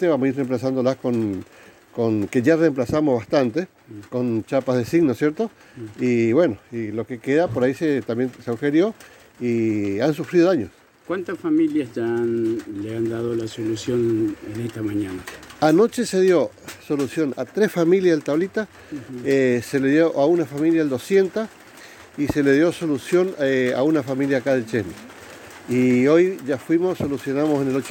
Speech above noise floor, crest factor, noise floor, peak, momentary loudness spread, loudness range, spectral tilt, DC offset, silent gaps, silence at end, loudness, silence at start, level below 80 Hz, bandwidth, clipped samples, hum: 23 dB; 16 dB; -44 dBFS; -4 dBFS; 12 LU; 3 LU; -6.5 dB/octave; under 0.1%; none; 0 s; -21 LUFS; 0 s; -58 dBFS; 17 kHz; under 0.1%; none